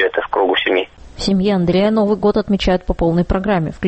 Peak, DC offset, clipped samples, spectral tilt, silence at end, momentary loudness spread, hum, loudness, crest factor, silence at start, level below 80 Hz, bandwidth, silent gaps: -4 dBFS; under 0.1%; under 0.1%; -6.5 dB/octave; 0 s; 4 LU; none; -16 LUFS; 12 dB; 0 s; -30 dBFS; 8.4 kHz; none